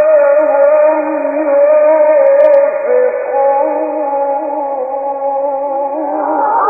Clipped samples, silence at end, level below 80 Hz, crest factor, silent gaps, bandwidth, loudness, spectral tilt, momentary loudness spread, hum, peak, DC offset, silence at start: under 0.1%; 0 s; -66 dBFS; 10 dB; none; 2.6 kHz; -12 LUFS; -7 dB/octave; 8 LU; none; 0 dBFS; under 0.1%; 0 s